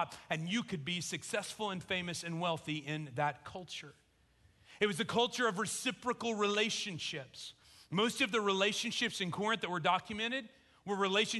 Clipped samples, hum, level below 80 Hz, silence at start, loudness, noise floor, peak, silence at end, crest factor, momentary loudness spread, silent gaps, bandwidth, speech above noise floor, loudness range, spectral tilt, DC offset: under 0.1%; none; -70 dBFS; 0 s; -35 LUFS; -68 dBFS; -16 dBFS; 0 s; 22 dB; 12 LU; none; 12 kHz; 33 dB; 5 LU; -3.5 dB/octave; under 0.1%